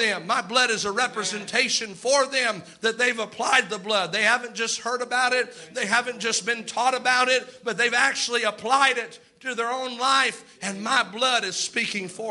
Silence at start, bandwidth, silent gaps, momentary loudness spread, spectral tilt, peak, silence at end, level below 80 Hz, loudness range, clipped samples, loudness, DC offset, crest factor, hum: 0 s; 11.5 kHz; none; 8 LU; -1 dB/octave; -6 dBFS; 0 s; -72 dBFS; 1 LU; under 0.1%; -23 LUFS; under 0.1%; 20 dB; none